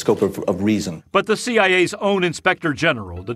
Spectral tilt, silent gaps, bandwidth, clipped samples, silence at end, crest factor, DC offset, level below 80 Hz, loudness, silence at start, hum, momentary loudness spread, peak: -4.5 dB/octave; none; 15 kHz; under 0.1%; 0 s; 18 dB; under 0.1%; -52 dBFS; -19 LUFS; 0 s; none; 6 LU; -2 dBFS